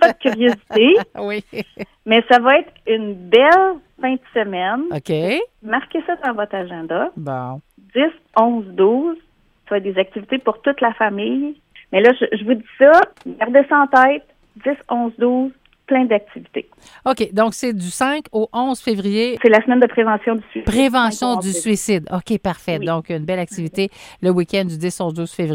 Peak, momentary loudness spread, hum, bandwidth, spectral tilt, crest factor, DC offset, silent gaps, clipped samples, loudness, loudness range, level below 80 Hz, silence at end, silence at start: 0 dBFS; 12 LU; none; 16 kHz; -5 dB/octave; 18 dB; under 0.1%; none; under 0.1%; -17 LUFS; 6 LU; -50 dBFS; 0 s; 0 s